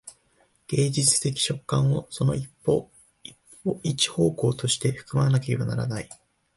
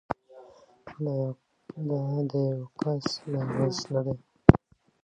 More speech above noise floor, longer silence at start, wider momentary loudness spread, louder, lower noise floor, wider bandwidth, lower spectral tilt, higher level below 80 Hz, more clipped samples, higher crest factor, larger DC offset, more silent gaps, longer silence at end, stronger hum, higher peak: first, 40 dB vs 24 dB; about the same, 0.05 s vs 0.1 s; second, 13 LU vs 17 LU; first, -25 LUFS vs -28 LUFS; first, -65 dBFS vs -53 dBFS; first, 11.5 kHz vs 8.8 kHz; second, -4.5 dB/octave vs -7 dB/octave; second, -54 dBFS vs -46 dBFS; neither; second, 18 dB vs 28 dB; neither; neither; about the same, 0.4 s vs 0.45 s; neither; second, -8 dBFS vs 0 dBFS